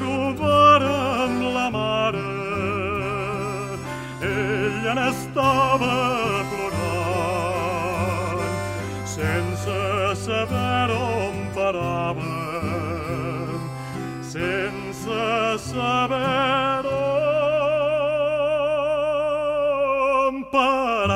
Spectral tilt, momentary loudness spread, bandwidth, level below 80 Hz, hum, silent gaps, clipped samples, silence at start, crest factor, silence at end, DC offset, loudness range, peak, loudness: -5.5 dB/octave; 8 LU; 16 kHz; -48 dBFS; none; none; under 0.1%; 0 s; 18 dB; 0 s; under 0.1%; 5 LU; -4 dBFS; -23 LUFS